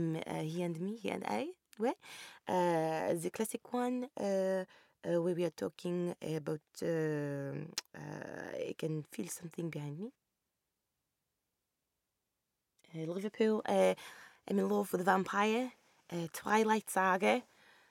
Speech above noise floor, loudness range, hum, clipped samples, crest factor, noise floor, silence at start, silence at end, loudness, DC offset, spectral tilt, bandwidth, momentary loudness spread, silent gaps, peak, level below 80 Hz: 52 dB; 12 LU; none; under 0.1%; 22 dB; -87 dBFS; 0 s; 0.45 s; -36 LUFS; under 0.1%; -5.5 dB/octave; 17 kHz; 14 LU; none; -16 dBFS; -82 dBFS